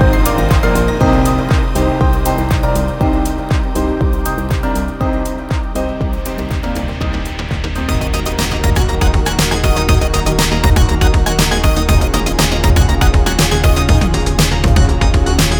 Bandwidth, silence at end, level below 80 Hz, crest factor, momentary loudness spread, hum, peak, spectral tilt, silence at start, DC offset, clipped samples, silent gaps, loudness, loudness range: over 20 kHz; 0 s; -16 dBFS; 12 dB; 8 LU; none; 0 dBFS; -5 dB/octave; 0 s; under 0.1%; under 0.1%; none; -15 LUFS; 6 LU